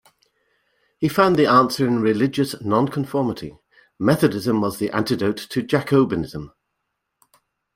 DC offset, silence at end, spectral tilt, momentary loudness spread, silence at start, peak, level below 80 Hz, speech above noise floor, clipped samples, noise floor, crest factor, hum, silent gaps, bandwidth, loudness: under 0.1%; 1.3 s; -6.5 dB/octave; 10 LU; 1 s; -2 dBFS; -54 dBFS; 58 dB; under 0.1%; -77 dBFS; 20 dB; none; none; 16.5 kHz; -20 LUFS